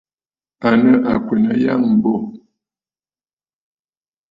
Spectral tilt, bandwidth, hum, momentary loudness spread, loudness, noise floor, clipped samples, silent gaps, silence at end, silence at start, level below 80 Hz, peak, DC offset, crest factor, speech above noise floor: -9 dB/octave; 5.2 kHz; none; 9 LU; -15 LUFS; under -90 dBFS; under 0.1%; none; 1.95 s; 0.6 s; -52 dBFS; -2 dBFS; under 0.1%; 16 dB; over 76 dB